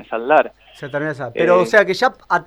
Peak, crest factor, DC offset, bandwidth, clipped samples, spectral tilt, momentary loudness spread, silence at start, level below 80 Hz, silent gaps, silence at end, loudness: -2 dBFS; 16 dB; under 0.1%; 13.5 kHz; under 0.1%; -5 dB/octave; 13 LU; 0.1 s; -58 dBFS; none; 0.05 s; -16 LUFS